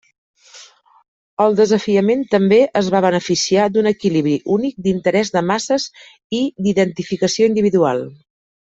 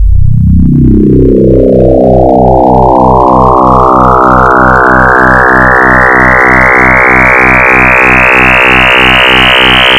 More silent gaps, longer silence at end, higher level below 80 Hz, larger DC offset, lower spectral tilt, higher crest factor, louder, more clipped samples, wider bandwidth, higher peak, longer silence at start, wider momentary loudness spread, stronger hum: first, 1.08-1.37 s, 6.24-6.30 s vs none; first, 0.6 s vs 0 s; second, -58 dBFS vs -14 dBFS; second, under 0.1% vs 0.3%; second, -5 dB/octave vs -6.5 dB/octave; first, 14 dB vs 4 dB; second, -16 LUFS vs -3 LUFS; second, under 0.1% vs 7%; second, 8 kHz vs 15.5 kHz; about the same, -2 dBFS vs 0 dBFS; first, 0.55 s vs 0 s; first, 7 LU vs 3 LU; neither